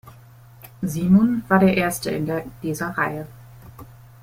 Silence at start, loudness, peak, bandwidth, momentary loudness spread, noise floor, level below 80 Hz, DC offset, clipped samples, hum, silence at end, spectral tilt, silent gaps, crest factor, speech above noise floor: 0.05 s; -21 LUFS; -4 dBFS; 16 kHz; 13 LU; -46 dBFS; -50 dBFS; under 0.1%; under 0.1%; none; 0.3 s; -6.5 dB/octave; none; 18 dB; 26 dB